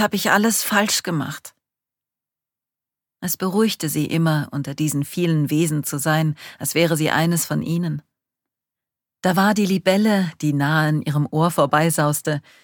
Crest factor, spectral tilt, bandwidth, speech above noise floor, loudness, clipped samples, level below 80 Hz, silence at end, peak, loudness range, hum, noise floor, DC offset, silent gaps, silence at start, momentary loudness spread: 20 dB; -5 dB/octave; 19 kHz; 69 dB; -20 LUFS; under 0.1%; -62 dBFS; 0.25 s; -2 dBFS; 5 LU; none; -88 dBFS; under 0.1%; none; 0 s; 8 LU